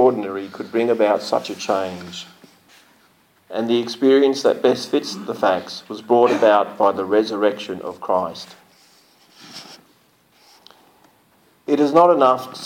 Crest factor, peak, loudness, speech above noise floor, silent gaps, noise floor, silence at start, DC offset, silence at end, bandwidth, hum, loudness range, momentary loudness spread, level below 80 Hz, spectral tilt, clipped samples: 16 dB; -4 dBFS; -19 LUFS; 39 dB; none; -57 dBFS; 0 s; under 0.1%; 0 s; 17 kHz; none; 10 LU; 20 LU; -70 dBFS; -5 dB/octave; under 0.1%